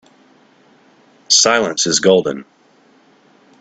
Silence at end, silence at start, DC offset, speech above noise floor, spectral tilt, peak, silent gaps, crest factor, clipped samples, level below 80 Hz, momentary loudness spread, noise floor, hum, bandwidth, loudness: 1.2 s; 1.3 s; under 0.1%; 37 dB; -2 dB/octave; 0 dBFS; none; 18 dB; under 0.1%; -60 dBFS; 12 LU; -52 dBFS; none; 9.4 kHz; -13 LUFS